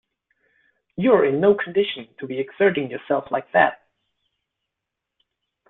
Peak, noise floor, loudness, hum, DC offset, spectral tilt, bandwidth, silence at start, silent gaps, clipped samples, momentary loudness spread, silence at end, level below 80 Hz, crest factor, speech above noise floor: -2 dBFS; -83 dBFS; -21 LUFS; none; under 0.1%; -10 dB/octave; 4 kHz; 1 s; none; under 0.1%; 12 LU; 1.95 s; -64 dBFS; 20 dB; 63 dB